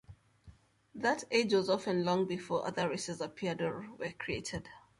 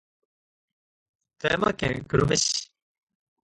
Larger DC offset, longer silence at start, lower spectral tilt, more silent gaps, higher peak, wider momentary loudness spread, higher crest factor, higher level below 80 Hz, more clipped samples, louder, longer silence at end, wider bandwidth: neither; second, 0.1 s vs 1.4 s; about the same, -4.5 dB/octave vs -3.5 dB/octave; neither; second, -16 dBFS vs -8 dBFS; first, 11 LU vs 8 LU; about the same, 18 dB vs 22 dB; second, -64 dBFS vs -50 dBFS; neither; second, -34 LUFS vs -25 LUFS; second, 0.2 s vs 0.8 s; about the same, 11.5 kHz vs 11.5 kHz